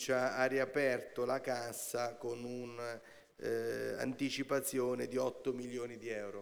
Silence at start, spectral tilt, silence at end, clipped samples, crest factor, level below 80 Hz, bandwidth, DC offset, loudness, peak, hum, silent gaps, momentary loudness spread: 0 s; -4 dB/octave; 0 s; under 0.1%; 18 dB; -76 dBFS; over 20 kHz; under 0.1%; -38 LUFS; -20 dBFS; none; none; 10 LU